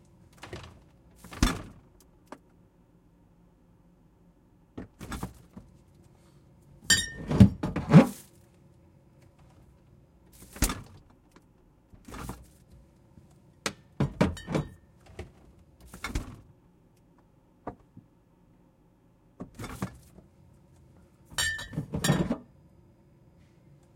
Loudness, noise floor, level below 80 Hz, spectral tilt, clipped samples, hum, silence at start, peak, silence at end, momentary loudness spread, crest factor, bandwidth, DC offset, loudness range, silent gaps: -28 LUFS; -62 dBFS; -46 dBFS; -5 dB/octave; under 0.1%; none; 0.45 s; -2 dBFS; 1.55 s; 29 LU; 30 dB; 16.5 kHz; under 0.1%; 22 LU; none